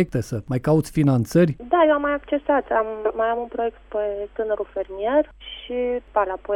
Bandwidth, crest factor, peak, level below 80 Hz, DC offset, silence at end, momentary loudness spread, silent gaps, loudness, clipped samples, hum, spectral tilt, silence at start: 17 kHz; 16 dB; -6 dBFS; -48 dBFS; under 0.1%; 0 s; 9 LU; none; -22 LUFS; under 0.1%; none; -7.5 dB/octave; 0 s